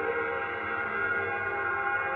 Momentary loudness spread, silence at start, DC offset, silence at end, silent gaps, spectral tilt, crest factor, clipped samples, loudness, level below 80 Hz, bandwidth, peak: 3 LU; 0 s; under 0.1%; 0 s; none; -7 dB/octave; 14 dB; under 0.1%; -30 LUFS; -62 dBFS; 5.2 kHz; -18 dBFS